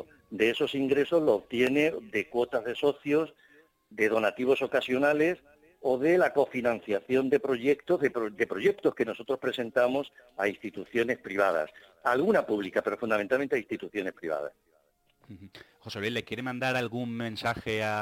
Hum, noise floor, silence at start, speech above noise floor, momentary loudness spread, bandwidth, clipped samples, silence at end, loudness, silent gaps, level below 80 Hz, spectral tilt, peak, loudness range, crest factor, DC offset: none; -69 dBFS; 0 s; 41 dB; 10 LU; 16.5 kHz; under 0.1%; 0 s; -28 LUFS; none; -66 dBFS; -5.5 dB/octave; -10 dBFS; 7 LU; 18 dB; under 0.1%